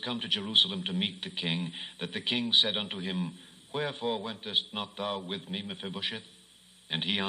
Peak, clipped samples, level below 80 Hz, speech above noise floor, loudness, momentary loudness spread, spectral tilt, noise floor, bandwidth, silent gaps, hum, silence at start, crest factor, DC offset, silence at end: -10 dBFS; under 0.1%; -76 dBFS; 26 dB; -30 LUFS; 14 LU; -4.5 dB/octave; -58 dBFS; 11.5 kHz; none; none; 0 s; 24 dB; under 0.1%; 0 s